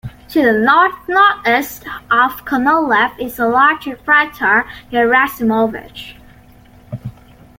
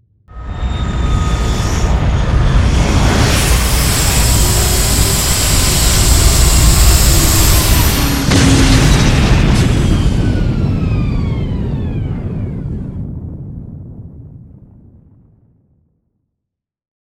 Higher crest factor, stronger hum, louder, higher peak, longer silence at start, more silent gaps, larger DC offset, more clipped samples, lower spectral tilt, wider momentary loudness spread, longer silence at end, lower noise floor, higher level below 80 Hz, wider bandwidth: about the same, 14 dB vs 12 dB; neither; about the same, -14 LUFS vs -12 LUFS; about the same, 0 dBFS vs 0 dBFS; second, 0.05 s vs 0.3 s; neither; neither; neither; about the same, -5 dB/octave vs -4 dB/octave; first, 19 LU vs 14 LU; second, 0.5 s vs 2.75 s; second, -43 dBFS vs -79 dBFS; second, -46 dBFS vs -16 dBFS; about the same, 17 kHz vs 17 kHz